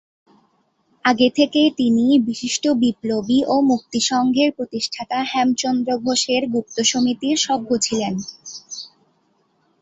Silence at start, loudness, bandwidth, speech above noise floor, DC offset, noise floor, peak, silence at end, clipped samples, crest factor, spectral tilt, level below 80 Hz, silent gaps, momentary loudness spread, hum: 1.05 s; -19 LUFS; 8.2 kHz; 45 dB; under 0.1%; -64 dBFS; -2 dBFS; 0.95 s; under 0.1%; 18 dB; -3 dB/octave; -60 dBFS; none; 9 LU; none